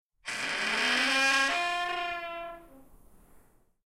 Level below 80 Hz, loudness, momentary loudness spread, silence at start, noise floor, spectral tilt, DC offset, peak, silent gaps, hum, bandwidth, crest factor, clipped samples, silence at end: -62 dBFS; -28 LUFS; 15 LU; 0.25 s; -60 dBFS; -0.5 dB/octave; under 0.1%; -14 dBFS; none; none; 16 kHz; 18 dB; under 0.1%; 0.95 s